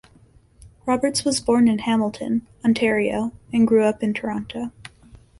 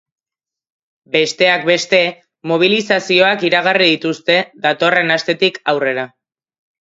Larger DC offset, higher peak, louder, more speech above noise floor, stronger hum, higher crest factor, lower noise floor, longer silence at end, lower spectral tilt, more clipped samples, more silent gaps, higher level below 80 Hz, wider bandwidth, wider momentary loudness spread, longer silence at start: neither; second, -6 dBFS vs 0 dBFS; second, -21 LUFS vs -14 LUFS; second, 33 dB vs 73 dB; neither; about the same, 16 dB vs 16 dB; second, -53 dBFS vs -87 dBFS; second, 0.25 s vs 0.75 s; about the same, -4.5 dB/octave vs -4 dB/octave; neither; neither; first, -52 dBFS vs -66 dBFS; first, 11.5 kHz vs 8 kHz; first, 11 LU vs 7 LU; second, 0.85 s vs 1.15 s